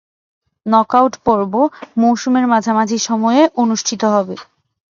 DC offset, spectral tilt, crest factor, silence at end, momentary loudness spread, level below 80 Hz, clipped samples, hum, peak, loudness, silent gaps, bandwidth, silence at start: under 0.1%; -4.5 dB/octave; 16 dB; 0.5 s; 5 LU; -56 dBFS; under 0.1%; none; 0 dBFS; -15 LUFS; none; 7.4 kHz; 0.65 s